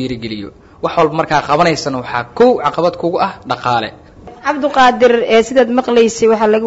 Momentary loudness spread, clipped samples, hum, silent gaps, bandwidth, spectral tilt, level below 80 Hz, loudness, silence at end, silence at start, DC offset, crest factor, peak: 11 LU; under 0.1%; none; none; 8 kHz; -5 dB/octave; -46 dBFS; -13 LUFS; 0 s; 0 s; under 0.1%; 12 dB; 0 dBFS